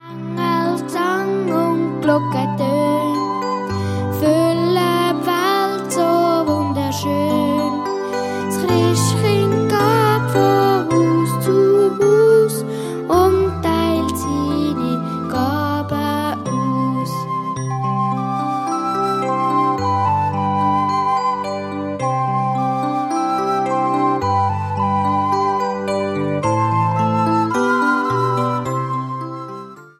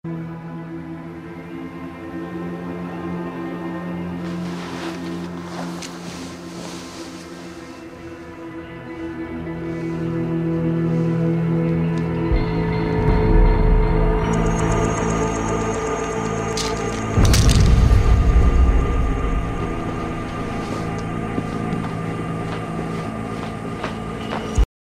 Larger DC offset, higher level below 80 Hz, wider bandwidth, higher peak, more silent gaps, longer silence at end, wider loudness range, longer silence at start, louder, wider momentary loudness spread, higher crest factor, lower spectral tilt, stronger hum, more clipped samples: neither; second, -48 dBFS vs -24 dBFS; first, 16 kHz vs 14.5 kHz; about the same, -4 dBFS vs -4 dBFS; neither; second, 0.15 s vs 0.35 s; second, 5 LU vs 13 LU; about the same, 0.05 s vs 0.05 s; first, -18 LUFS vs -22 LUFS; second, 7 LU vs 16 LU; about the same, 14 dB vs 18 dB; about the same, -6 dB/octave vs -6 dB/octave; neither; neither